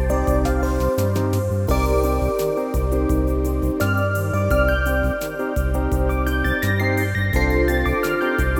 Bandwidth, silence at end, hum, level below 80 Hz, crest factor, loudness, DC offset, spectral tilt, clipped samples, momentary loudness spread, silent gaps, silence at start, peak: 19 kHz; 0 s; none; -24 dBFS; 14 dB; -21 LUFS; under 0.1%; -6.5 dB/octave; under 0.1%; 3 LU; none; 0 s; -6 dBFS